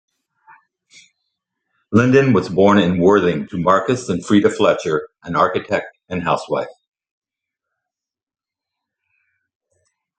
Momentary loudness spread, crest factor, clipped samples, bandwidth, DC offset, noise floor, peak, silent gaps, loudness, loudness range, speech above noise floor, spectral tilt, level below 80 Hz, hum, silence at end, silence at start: 10 LU; 20 dB; under 0.1%; 9.2 kHz; under 0.1%; -90 dBFS; 0 dBFS; none; -17 LUFS; 12 LU; 74 dB; -6.5 dB/octave; -58 dBFS; none; 3.5 s; 1.9 s